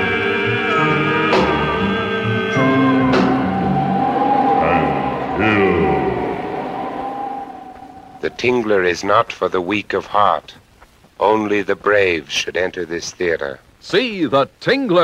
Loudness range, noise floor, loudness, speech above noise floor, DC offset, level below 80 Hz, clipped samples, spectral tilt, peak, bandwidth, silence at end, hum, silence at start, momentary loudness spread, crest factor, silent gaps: 4 LU; -48 dBFS; -17 LUFS; 31 dB; under 0.1%; -44 dBFS; under 0.1%; -5.5 dB/octave; 0 dBFS; 12.5 kHz; 0 s; none; 0 s; 10 LU; 16 dB; none